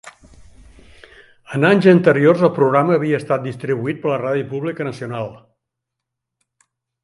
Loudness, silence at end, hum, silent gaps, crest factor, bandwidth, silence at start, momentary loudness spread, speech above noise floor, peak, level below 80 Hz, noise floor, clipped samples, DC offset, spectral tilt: -17 LUFS; 1.65 s; none; none; 18 dB; 11.5 kHz; 0.05 s; 15 LU; 65 dB; 0 dBFS; -56 dBFS; -81 dBFS; under 0.1%; under 0.1%; -8 dB/octave